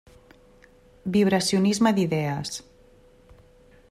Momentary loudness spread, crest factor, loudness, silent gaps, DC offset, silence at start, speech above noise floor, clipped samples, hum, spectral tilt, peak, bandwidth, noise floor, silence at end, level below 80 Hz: 14 LU; 18 dB; -23 LUFS; none; under 0.1%; 1.05 s; 32 dB; under 0.1%; none; -5 dB/octave; -10 dBFS; 14 kHz; -55 dBFS; 1.3 s; -58 dBFS